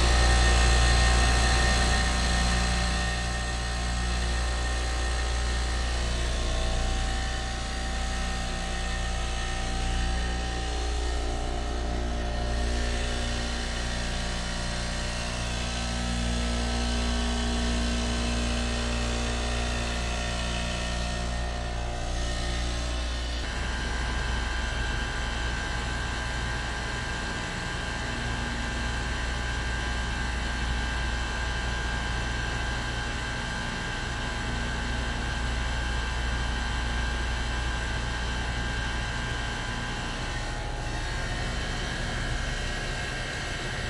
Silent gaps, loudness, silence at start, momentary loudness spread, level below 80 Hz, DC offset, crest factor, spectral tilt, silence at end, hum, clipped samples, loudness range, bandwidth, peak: none; -29 LUFS; 0 s; 6 LU; -30 dBFS; under 0.1%; 18 dB; -4 dB/octave; 0 s; none; under 0.1%; 3 LU; 11.5 kHz; -10 dBFS